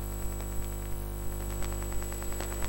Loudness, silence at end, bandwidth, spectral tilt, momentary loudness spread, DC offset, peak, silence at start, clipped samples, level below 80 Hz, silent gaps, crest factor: -37 LUFS; 0 s; 17 kHz; -4.5 dB/octave; 2 LU; under 0.1%; -18 dBFS; 0 s; under 0.1%; -36 dBFS; none; 16 dB